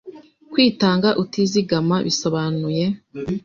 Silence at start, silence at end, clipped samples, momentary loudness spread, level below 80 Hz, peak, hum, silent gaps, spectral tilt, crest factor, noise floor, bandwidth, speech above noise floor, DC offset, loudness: 0.05 s; 0.05 s; under 0.1%; 8 LU; -54 dBFS; -2 dBFS; none; none; -5.5 dB/octave; 18 dB; -41 dBFS; 7.4 kHz; 22 dB; under 0.1%; -20 LUFS